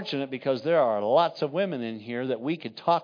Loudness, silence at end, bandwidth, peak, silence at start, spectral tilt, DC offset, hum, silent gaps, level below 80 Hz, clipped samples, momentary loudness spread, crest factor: -27 LUFS; 0 s; 5.2 kHz; -10 dBFS; 0 s; -7 dB/octave; under 0.1%; none; none; -82 dBFS; under 0.1%; 9 LU; 16 dB